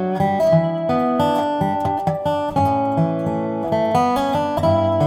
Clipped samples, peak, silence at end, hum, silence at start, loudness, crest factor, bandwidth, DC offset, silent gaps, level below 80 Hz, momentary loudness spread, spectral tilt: under 0.1%; -4 dBFS; 0 s; none; 0 s; -19 LUFS; 14 dB; 15 kHz; under 0.1%; none; -48 dBFS; 5 LU; -7.5 dB/octave